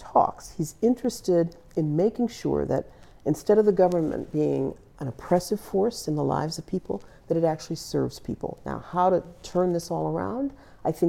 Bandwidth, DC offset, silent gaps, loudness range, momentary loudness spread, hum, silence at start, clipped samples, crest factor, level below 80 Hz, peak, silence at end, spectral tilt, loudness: 16.5 kHz; under 0.1%; none; 4 LU; 11 LU; none; 0 s; under 0.1%; 18 dB; -52 dBFS; -8 dBFS; 0 s; -7 dB/octave; -26 LUFS